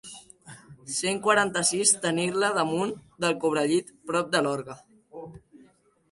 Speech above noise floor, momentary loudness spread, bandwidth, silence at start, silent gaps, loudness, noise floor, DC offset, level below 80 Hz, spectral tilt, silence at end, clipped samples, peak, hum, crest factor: 34 dB; 22 LU; 11.5 kHz; 0.05 s; none; -25 LUFS; -60 dBFS; under 0.1%; -68 dBFS; -3 dB/octave; 0.55 s; under 0.1%; -4 dBFS; none; 22 dB